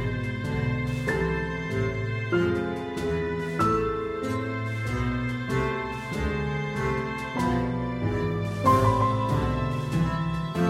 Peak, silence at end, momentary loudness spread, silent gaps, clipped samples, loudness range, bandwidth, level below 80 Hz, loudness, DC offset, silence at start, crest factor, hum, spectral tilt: -8 dBFS; 0 s; 6 LU; none; under 0.1%; 3 LU; 15.5 kHz; -40 dBFS; -27 LUFS; under 0.1%; 0 s; 18 dB; none; -7 dB/octave